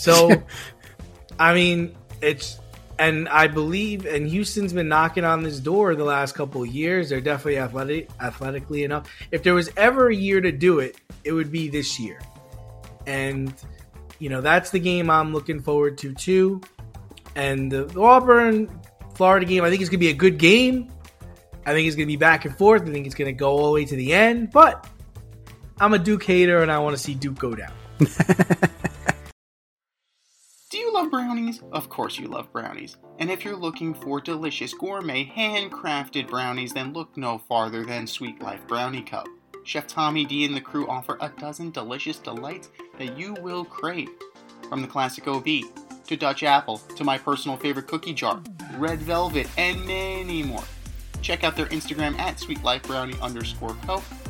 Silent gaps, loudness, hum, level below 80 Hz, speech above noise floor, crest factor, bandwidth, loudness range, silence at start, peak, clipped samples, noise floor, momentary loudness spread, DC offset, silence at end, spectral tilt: 29.32-29.77 s; -22 LUFS; none; -44 dBFS; 52 dB; 22 dB; 17 kHz; 11 LU; 0 s; 0 dBFS; under 0.1%; -74 dBFS; 17 LU; under 0.1%; 0 s; -5 dB/octave